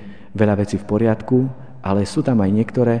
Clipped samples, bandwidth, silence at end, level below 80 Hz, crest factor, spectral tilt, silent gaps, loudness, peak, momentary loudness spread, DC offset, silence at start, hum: under 0.1%; 10 kHz; 0 s; -48 dBFS; 16 dB; -8 dB/octave; none; -19 LUFS; -2 dBFS; 7 LU; 1%; 0 s; none